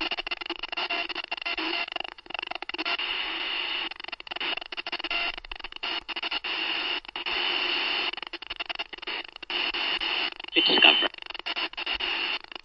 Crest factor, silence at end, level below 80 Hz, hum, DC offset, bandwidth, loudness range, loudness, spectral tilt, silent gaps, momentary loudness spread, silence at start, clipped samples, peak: 28 dB; 0.25 s; -58 dBFS; none; under 0.1%; 7.4 kHz; 7 LU; -27 LUFS; -2.5 dB/octave; none; 10 LU; 0 s; under 0.1%; -2 dBFS